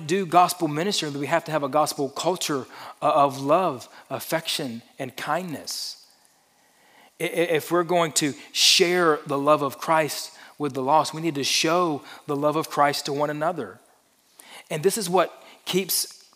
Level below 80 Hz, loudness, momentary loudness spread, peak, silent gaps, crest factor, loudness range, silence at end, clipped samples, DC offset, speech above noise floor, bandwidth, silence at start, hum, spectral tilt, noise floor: -82 dBFS; -23 LUFS; 13 LU; -4 dBFS; none; 22 dB; 7 LU; 0.2 s; under 0.1%; under 0.1%; 37 dB; 16 kHz; 0 s; none; -3 dB/octave; -61 dBFS